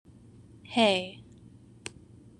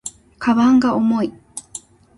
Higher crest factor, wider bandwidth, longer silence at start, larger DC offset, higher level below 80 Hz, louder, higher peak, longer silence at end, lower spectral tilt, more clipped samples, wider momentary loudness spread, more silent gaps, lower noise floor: first, 24 dB vs 14 dB; about the same, 11 kHz vs 11.5 kHz; first, 0.7 s vs 0.05 s; neither; second, -64 dBFS vs -52 dBFS; second, -26 LUFS vs -17 LUFS; about the same, -8 dBFS vs -6 dBFS; first, 1.2 s vs 0.4 s; about the same, -4 dB/octave vs -5 dB/octave; neither; about the same, 20 LU vs 21 LU; neither; first, -53 dBFS vs -39 dBFS